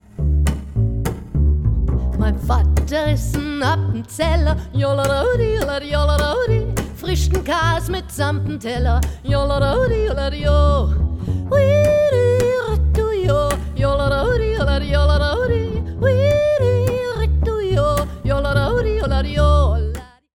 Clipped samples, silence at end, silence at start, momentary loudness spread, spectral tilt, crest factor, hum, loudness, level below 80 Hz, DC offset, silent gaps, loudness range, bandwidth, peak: under 0.1%; 0.35 s; 0.15 s; 6 LU; -6.5 dB/octave; 14 dB; none; -18 LUFS; -22 dBFS; under 0.1%; none; 3 LU; 16 kHz; -4 dBFS